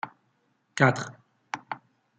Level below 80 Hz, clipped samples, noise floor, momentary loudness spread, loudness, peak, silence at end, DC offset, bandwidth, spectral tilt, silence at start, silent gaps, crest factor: -72 dBFS; under 0.1%; -71 dBFS; 17 LU; -26 LUFS; -6 dBFS; 0.4 s; under 0.1%; 9.2 kHz; -5.5 dB/octave; 0.05 s; none; 24 dB